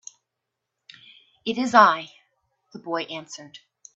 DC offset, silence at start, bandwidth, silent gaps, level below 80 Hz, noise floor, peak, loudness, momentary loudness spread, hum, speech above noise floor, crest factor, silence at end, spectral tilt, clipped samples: under 0.1%; 1.45 s; 8.2 kHz; none; -74 dBFS; -83 dBFS; 0 dBFS; -21 LUFS; 24 LU; none; 61 dB; 26 dB; 0.4 s; -3.5 dB/octave; under 0.1%